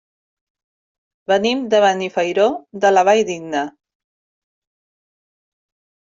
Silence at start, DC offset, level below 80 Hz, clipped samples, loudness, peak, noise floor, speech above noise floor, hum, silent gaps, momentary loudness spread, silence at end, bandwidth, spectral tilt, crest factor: 1.3 s; under 0.1%; -66 dBFS; under 0.1%; -17 LUFS; -2 dBFS; under -90 dBFS; over 74 dB; none; none; 10 LU; 2.3 s; 7.8 kHz; -4 dB/octave; 18 dB